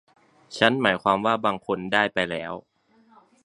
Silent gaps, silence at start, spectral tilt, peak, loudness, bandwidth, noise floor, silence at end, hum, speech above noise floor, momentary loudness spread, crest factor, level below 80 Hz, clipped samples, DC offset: none; 0.5 s; -5 dB/octave; 0 dBFS; -23 LUFS; 11 kHz; -58 dBFS; 0.85 s; none; 34 dB; 15 LU; 24 dB; -62 dBFS; under 0.1%; under 0.1%